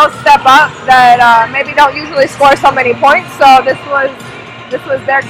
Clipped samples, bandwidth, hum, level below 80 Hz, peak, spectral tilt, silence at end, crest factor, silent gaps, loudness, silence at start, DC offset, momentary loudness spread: 4%; over 20 kHz; none; -44 dBFS; 0 dBFS; -3.5 dB/octave; 0 s; 8 dB; none; -8 LUFS; 0 s; under 0.1%; 13 LU